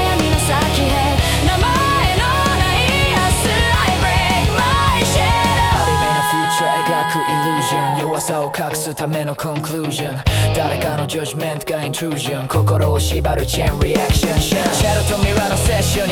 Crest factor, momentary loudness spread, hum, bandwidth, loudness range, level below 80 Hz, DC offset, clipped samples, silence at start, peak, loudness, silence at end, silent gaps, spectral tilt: 14 dB; 7 LU; none; 18 kHz; 5 LU; -26 dBFS; under 0.1%; under 0.1%; 0 s; -2 dBFS; -16 LUFS; 0 s; none; -4.5 dB/octave